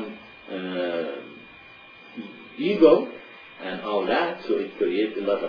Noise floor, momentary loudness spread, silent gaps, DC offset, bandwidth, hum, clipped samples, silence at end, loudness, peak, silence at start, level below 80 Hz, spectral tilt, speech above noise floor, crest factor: -47 dBFS; 25 LU; none; under 0.1%; 5.4 kHz; none; under 0.1%; 0 s; -24 LUFS; -4 dBFS; 0 s; -62 dBFS; -7.5 dB/octave; 25 dB; 22 dB